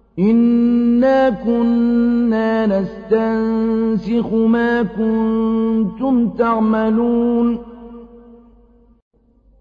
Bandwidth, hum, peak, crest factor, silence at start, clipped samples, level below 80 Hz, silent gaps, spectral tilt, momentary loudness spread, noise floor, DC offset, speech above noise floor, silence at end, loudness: 5 kHz; none; -4 dBFS; 12 dB; 0.15 s; under 0.1%; -46 dBFS; none; -9 dB/octave; 5 LU; -49 dBFS; under 0.1%; 34 dB; 1.45 s; -16 LUFS